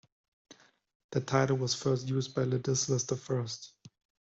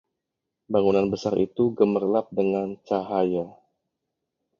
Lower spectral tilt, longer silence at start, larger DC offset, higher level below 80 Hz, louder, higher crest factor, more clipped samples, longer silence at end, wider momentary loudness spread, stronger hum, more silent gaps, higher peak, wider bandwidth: second, -5 dB/octave vs -7.5 dB/octave; second, 0.5 s vs 0.7 s; neither; second, -68 dBFS vs -60 dBFS; second, -31 LUFS vs -24 LUFS; about the same, 20 dB vs 20 dB; neither; second, 0.3 s vs 1.1 s; about the same, 9 LU vs 7 LU; neither; first, 0.95-1.09 s vs none; second, -12 dBFS vs -6 dBFS; first, 8 kHz vs 7.2 kHz